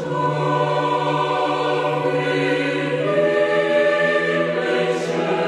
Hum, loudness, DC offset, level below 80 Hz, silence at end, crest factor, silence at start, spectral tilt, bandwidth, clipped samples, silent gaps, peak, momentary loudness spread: none; -19 LUFS; under 0.1%; -62 dBFS; 0 s; 12 dB; 0 s; -6 dB/octave; 11 kHz; under 0.1%; none; -6 dBFS; 4 LU